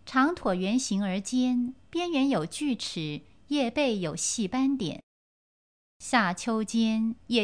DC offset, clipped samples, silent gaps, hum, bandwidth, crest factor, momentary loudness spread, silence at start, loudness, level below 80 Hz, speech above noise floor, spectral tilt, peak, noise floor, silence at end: 0.1%; under 0.1%; 5.03-6.00 s; none; 10.5 kHz; 18 dB; 7 LU; 0.05 s; -28 LUFS; -62 dBFS; over 63 dB; -4 dB/octave; -10 dBFS; under -90 dBFS; 0 s